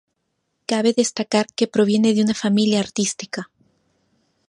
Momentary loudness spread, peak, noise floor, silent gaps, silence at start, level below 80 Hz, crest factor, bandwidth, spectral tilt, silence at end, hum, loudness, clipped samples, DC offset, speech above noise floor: 14 LU; -4 dBFS; -73 dBFS; none; 0.7 s; -64 dBFS; 18 dB; 11.5 kHz; -4.5 dB/octave; 1.05 s; none; -19 LUFS; under 0.1%; under 0.1%; 54 dB